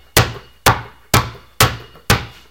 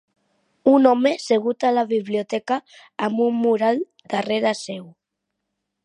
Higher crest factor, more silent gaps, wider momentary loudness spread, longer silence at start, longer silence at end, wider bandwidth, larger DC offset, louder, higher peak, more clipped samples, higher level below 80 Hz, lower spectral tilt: about the same, 18 dB vs 18 dB; neither; second, 7 LU vs 11 LU; second, 0.15 s vs 0.65 s; second, 0.2 s vs 0.95 s; first, over 20 kHz vs 11 kHz; first, 0.3% vs under 0.1%; first, -17 LUFS vs -21 LUFS; about the same, 0 dBFS vs -2 dBFS; neither; first, -32 dBFS vs -74 dBFS; second, -3.5 dB/octave vs -5 dB/octave